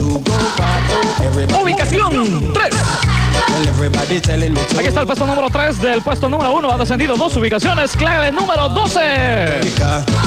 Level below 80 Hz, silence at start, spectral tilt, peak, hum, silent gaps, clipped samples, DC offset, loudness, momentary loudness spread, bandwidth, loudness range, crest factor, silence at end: -26 dBFS; 0 s; -5 dB/octave; -2 dBFS; none; none; under 0.1%; 0.2%; -15 LUFS; 2 LU; 15 kHz; 1 LU; 12 dB; 0 s